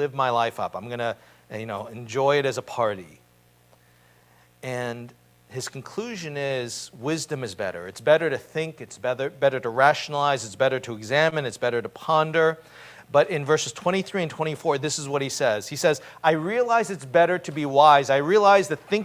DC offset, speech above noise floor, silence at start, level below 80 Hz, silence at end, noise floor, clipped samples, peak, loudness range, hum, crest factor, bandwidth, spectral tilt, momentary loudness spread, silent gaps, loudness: under 0.1%; 35 dB; 0 s; -66 dBFS; 0 s; -59 dBFS; under 0.1%; -2 dBFS; 11 LU; none; 22 dB; 16 kHz; -4 dB/octave; 14 LU; none; -24 LUFS